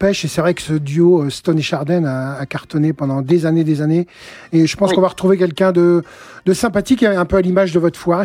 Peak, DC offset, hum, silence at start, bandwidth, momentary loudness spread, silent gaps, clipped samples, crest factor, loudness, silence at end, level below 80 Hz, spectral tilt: -2 dBFS; under 0.1%; none; 0 s; 15.5 kHz; 7 LU; none; under 0.1%; 12 dB; -16 LUFS; 0 s; -44 dBFS; -6.5 dB/octave